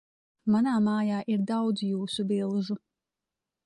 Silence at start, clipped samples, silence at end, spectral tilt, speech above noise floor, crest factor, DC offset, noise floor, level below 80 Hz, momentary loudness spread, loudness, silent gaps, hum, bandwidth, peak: 0.45 s; under 0.1%; 0.9 s; -6.5 dB/octave; 62 dB; 12 dB; under 0.1%; -89 dBFS; -70 dBFS; 8 LU; -28 LUFS; none; none; 11 kHz; -16 dBFS